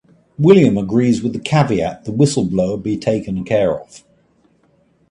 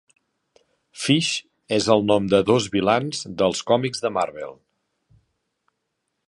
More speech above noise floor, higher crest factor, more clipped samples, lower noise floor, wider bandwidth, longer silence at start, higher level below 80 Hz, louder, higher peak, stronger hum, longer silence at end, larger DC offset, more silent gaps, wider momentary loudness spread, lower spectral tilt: second, 42 dB vs 56 dB; about the same, 16 dB vs 20 dB; neither; second, -57 dBFS vs -77 dBFS; about the same, 11 kHz vs 11.5 kHz; second, 0.4 s vs 0.95 s; first, -46 dBFS vs -56 dBFS; first, -16 LUFS vs -21 LUFS; about the same, 0 dBFS vs -2 dBFS; neither; second, 1.1 s vs 1.75 s; neither; neither; about the same, 9 LU vs 11 LU; first, -7 dB/octave vs -4.5 dB/octave